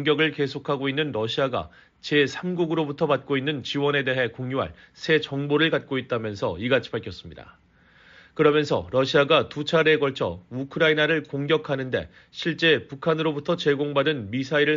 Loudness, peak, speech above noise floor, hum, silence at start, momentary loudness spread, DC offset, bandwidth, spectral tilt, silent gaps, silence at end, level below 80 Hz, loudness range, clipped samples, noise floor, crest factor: -24 LUFS; -6 dBFS; 31 dB; none; 0 s; 11 LU; under 0.1%; 7.6 kHz; -3.5 dB/octave; none; 0 s; -58 dBFS; 4 LU; under 0.1%; -55 dBFS; 18 dB